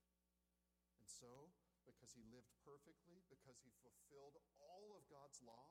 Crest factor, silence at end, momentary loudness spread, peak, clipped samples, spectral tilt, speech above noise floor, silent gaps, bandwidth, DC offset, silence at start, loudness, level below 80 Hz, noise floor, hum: 22 dB; 0 s; 8 LU; -46 dBFS; under 0.1%; -3.5 dB/octave; 22 dB; none; 15.5 kHz; under 0.1%; 0 s; -66 LUFS; -90 dBFS; -89 dBFS; 60 Hz at -85 dBFS